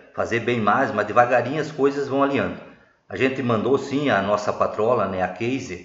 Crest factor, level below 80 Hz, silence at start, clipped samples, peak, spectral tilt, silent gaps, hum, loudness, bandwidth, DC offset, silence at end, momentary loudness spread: 20 dB; -60 dBFS; 0.15 s; under 0.1%; -2 dBFS; -6 dB/octave; none; none; -22 LUFS; 7.8 kHz; under 0.1%; 0 s; 7 LU